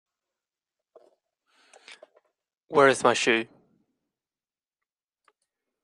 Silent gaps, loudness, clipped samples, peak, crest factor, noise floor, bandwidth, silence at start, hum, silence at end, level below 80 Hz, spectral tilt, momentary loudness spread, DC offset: none; -22 LUFS; under 0.1%; -4 dBFS; 24 dB; under -90 dBFS; 11 kHz; 2.7 s; none; 2.4 s; -76 dBFS; -3 dB/octave; 7 LU; under 0.1%